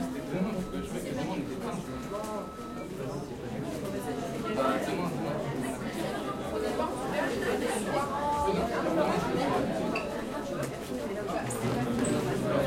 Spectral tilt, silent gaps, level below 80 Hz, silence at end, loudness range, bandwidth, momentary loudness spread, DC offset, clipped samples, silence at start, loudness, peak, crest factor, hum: -5.5 dB/octave; none; -52 dBFS; 0 s; 6 LU; 16.5 kHz; 8 LU; under 0.1%; under 0.1%; 0 s; -32 LUFS; -16 dBFS; 16 dB; none